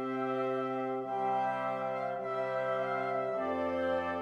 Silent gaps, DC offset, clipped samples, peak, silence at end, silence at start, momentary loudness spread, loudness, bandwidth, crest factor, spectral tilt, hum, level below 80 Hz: none; under 0.1%; under 0.1%; -22 dBFS; 0 s; 0 s; 3 LU; -34 LUFS; 10 kHz; 12 dB; -7 dB/octave; none; -72 dBFS